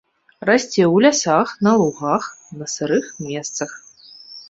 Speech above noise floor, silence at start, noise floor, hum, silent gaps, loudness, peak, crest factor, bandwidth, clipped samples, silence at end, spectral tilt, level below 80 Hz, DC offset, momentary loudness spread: 26 dB; 0.4 s; -44 dBFS; none; none; -18 LUFS; -2 dBFS; 18 dB; 8 kHz; under 0.1%; 0.05 s; -4.5 dB/octave; -62 dBFS; under 0.1%; 16 LU